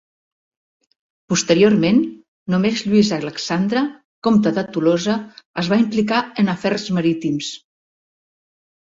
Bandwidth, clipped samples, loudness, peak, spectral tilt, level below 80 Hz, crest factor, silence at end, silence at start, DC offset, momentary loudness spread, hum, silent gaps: 8 kHz; under 0.1%; -18 LUFS; -2 dBFS; -5.5 dB/octave; -58 dBFS; 16 dB; 1.35 s; 1.3 s; under 0.1%; 11 LU; none; 2.28-2.46 s, 4.05-4.22 s, 5.45-5.54 s